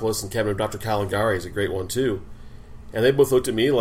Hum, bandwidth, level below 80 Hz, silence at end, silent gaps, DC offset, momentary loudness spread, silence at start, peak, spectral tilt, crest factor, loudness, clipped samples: none; 16 kHz; -44 dBFS; 0 s; none; under 0.1%; 7 LU; 0 s; -6 dBFS; -5 dB/octave; 16 dB; -23 LUFS; under 0.1%